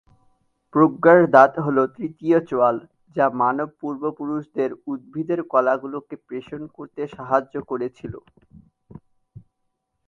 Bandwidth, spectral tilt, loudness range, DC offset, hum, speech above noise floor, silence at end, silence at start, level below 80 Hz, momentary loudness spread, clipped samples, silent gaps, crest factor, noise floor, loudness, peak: 7 kHz; -8.5 dB/octave; 12 LU; under 0.1%; none; 54 dB; 1.9 s; 0.75 s; -62 dBFS; 19 LU; under 0.1%; none; 22 dB; -75 dBFS; -20 LUFS; 0 dBFS